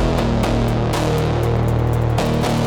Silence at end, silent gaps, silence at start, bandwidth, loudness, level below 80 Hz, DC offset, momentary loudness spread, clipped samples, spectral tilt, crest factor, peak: 0 s; none; 0 s; 17.5 kHz; -18 LUFS; -26 dBFS; under 0.1%; 0 LU; under 0.1%; -6.5 dB/octave; 12 dB; -4 dBFS